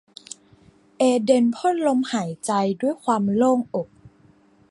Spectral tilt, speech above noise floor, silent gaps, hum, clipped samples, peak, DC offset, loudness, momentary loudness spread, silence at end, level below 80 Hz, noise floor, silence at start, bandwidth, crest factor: -5.5 dB/octave; 35 dB; none; none; under 0.1%; -4 dBFS; under 0.1%; -21 LUFS; 20 LU; 0.65 s; -66 dBFS; -56 dBFS; 1 s; 11.5 kHz; 18 dB